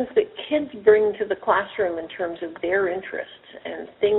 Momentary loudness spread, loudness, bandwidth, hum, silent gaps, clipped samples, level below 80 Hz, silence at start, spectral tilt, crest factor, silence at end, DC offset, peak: 16 LU; -23 LUFS; 4.1 kHz; none; none; under 0.1%; -60 dBFS; 0 s; -2.5 dB/octave; 20 dB; 0 s; under 0.1%; -4 dBFS